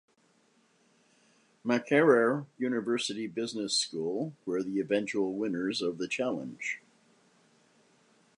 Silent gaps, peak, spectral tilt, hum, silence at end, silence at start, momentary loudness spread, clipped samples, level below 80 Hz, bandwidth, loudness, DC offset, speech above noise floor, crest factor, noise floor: none; -10 dBFS; -4 dB/octave; none; 1.6 s; 1.65 s; 11 LU; under 0.1%; -80 dBFS; 11 kHz; -30 LUFS; under 0.1%; 38 dB; 22 dB; -68 dBFS